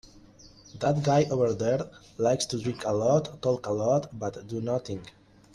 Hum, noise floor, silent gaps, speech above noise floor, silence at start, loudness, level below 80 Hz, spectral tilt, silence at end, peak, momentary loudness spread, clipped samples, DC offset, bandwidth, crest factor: none; -53 dBFS; none; 26 dB; 0.15 s; -27 LUFS; -60 dBFS; -6 dB/octave; 0.45 s; -10 dBFS; 11 LU; under 0.1%; under 0.1%; 12 kHz; 18 dB